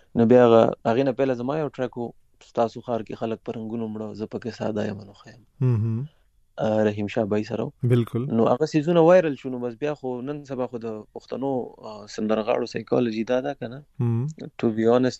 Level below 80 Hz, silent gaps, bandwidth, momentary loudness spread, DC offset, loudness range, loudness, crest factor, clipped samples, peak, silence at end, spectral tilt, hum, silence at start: -60 dBFS; none; 8.2 kHz; 15 LU; under 0.1%; 8 LU; -24 LUFS; 20 dB; under 0.1%; -4 dBFS; 0 s; -8 dB/octave; none; 0.15 s